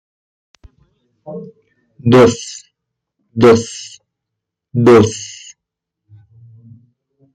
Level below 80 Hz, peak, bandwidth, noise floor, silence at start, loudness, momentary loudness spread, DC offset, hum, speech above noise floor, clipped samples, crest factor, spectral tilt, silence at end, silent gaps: -50 dBFS; -2 dBFS; 11 kHz; -80 dBFS; 1.25 s; -12 LUFS; 23 LU; under 0.1%; none; 68 dB; under 0.1%; 16 dB; -6 dB/octave; 2.1 s; none